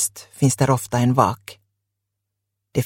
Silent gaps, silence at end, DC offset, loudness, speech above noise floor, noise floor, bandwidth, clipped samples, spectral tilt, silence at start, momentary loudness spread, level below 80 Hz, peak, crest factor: none; 0 s; under 0.1%; -20 LUFS; 60 dB; -79 dBFS; 17 kHz; under 0.1%; -5.5 dB/octave; 0 s; 9 LU; -54 dBFS; -2 dBFS; 20 dB